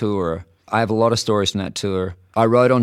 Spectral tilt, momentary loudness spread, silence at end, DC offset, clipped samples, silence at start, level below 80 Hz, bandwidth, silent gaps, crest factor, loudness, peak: -5.5 dB/octave; 10 LU; 0 s; under 0.1%; under 0.1%; 0 s; -50 dBFS; 15 kHz; none; 16 dB; -19 LUFS; -2 dBFS